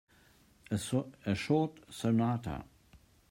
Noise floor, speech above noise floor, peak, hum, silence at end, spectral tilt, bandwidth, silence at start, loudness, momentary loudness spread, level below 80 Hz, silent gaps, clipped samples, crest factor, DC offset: -64 dBFS; 31 dB; -16 dBFS; none; 0.35 s; -6.5 dB/octave; 16 kHz; 0.7 s; -34 LUFS; 8 LU; -60 dBFS; none; under 0.1%; 18 dB; under 0.1%